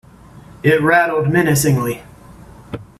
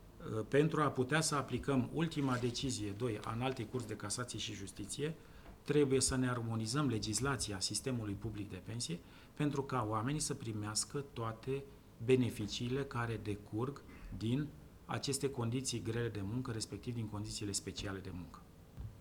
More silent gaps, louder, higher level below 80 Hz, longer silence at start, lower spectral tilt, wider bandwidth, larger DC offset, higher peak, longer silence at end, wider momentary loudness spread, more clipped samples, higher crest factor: neither; first, -15 LUFS vs -38 LUFS; first, -46 dBFS vs -58 dBFS; first, 0.65 s vs 0 s; about the same, -5.5 dB/octave vs -4.5 dB/octave; second, 16 kHz vs 20 kHz; neither; first, -2 dBFS vs -18 dBFS; first, 0.15 s vs 0 s; first, 18 LU vs 13 LU; neither; about the same, 16 dB vs 20 dB